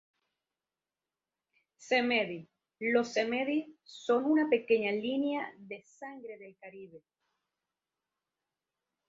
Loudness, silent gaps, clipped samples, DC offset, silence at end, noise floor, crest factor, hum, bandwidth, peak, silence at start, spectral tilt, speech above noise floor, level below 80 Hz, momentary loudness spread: -31 LUFS; none; under 0.1%; under 0.1%; 2.1 s; under -90 dBFS; 20 dB; none; 7.8 kHz; -16 dBFS; 1.8 s; -4.5 dB/octave; over 58 dB; -82 dBFS; 21 LU